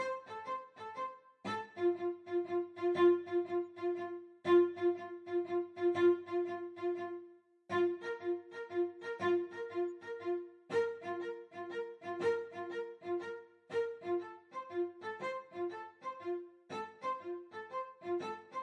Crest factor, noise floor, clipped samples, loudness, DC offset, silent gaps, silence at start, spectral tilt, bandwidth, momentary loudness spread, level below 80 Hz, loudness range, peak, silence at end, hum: 18 dB; -58 dBFS; under 0.1%; -38 LUFS; under 0.1%; none; 0 s; -6.5 dB/octave; 6.8 kHz; 14 LU; under -90 dBFS; 8 LU; -18 dBFS; 0 s; none